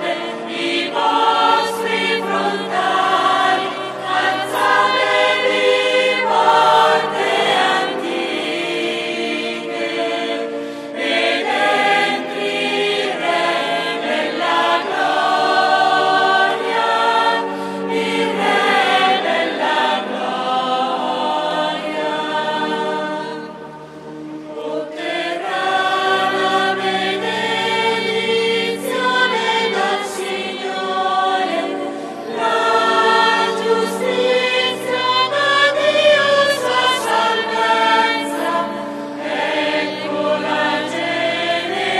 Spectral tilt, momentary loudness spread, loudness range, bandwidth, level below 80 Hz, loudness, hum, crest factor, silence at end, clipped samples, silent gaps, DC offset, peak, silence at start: -3 dB/octave; 9 LU; 5 LU; 14 kHz; -68 dBFS; -17 LUFS; none; 14 dB; 0 s; under 0.1%; none; under 0.1%; -2 dBFS; 0 s